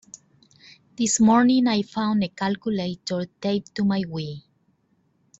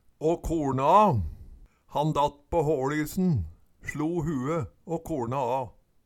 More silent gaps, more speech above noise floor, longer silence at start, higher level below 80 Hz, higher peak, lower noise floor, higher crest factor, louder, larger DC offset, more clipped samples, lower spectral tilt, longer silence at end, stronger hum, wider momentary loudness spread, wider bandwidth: neither; first, 44 dB vs 24 dB; first, 1 s vs 0.2 s; second, -62 dBFS vs -46 dBFS; about the same, -8 dBFS vs -8 dBFS; first, -66 dBFS vs -50 dBFS; about the same, 16 dB vs 20 dB; first, -23 LUFS vs -27 LUFS; neither; neither; second, -4.5 dB/octave vs -7 dB/octave; first, 1 s vs 0.35 s; neither; about the same, 13 LU vs 14 LU; second, 8.2 kHz vs 18 kHz